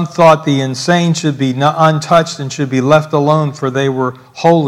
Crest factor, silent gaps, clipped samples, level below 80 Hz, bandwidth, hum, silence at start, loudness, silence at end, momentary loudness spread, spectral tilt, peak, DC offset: 12 dB; none; 0.7%; -54 dBFS; 13 kHz; none; 0 s; -13 LUFS; 0 s; 7 LU; -6 dB/octave; 0 dBFS; under 0.1%